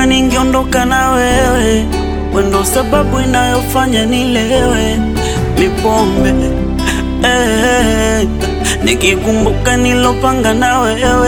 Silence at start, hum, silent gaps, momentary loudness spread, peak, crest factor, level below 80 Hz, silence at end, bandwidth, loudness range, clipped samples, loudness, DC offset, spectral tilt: 0 s; none; none; 4 LU; 0 dBFS; 12 dB; -20 dBFS; 0 s; 19 kHz; 1 LU; under 0.1%; -12 LUFS; 0.2%; -4.5 dB/octave